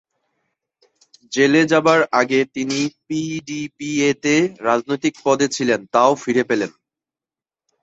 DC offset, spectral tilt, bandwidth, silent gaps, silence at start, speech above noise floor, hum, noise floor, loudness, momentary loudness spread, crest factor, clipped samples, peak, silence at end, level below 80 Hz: under 0.1%; -4.5 dB/octave; 8.2 kHz; none; 1.3 s; over 72 dB; none; under -90 dBFS; -18 LUFS; 11 LU; 18 dB; under 0.1%; 0 dBFS; 1.15 s; -62 dBFS